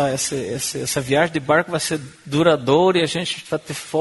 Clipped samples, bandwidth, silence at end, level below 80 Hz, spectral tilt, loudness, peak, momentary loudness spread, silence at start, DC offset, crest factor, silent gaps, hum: under 0.1%; 12 kHz; 0 s; -54 dBFS; -4 dB/octave; -20 LUFS; -2 dBFS; 9 LU; 0 s; under 0.1%; 18 dB; none; none